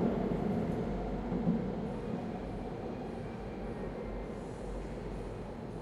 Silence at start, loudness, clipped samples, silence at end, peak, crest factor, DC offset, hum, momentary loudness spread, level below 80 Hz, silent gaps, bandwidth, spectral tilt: 0 s; -38 LUFS; under 0.1%; 0 s; -18 dBFS; 18 dB; under 0.1%; none; 9 LU; -46 dBFS; none; 11.5 kHz; -8.5 dB/octave